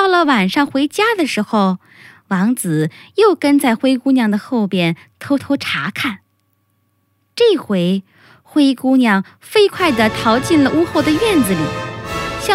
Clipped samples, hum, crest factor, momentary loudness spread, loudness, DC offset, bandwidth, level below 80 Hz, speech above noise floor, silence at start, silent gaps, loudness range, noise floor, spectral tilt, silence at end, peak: under 0.1%; none; 16 dB; 9 LU; -15 LUFS; under 0.1%; 16 kHz; -48 dBFS; 48 dB; 0 s; none; 5 LU; -63 dBFS; -5 dB/octave; 0 s; 0 dBFS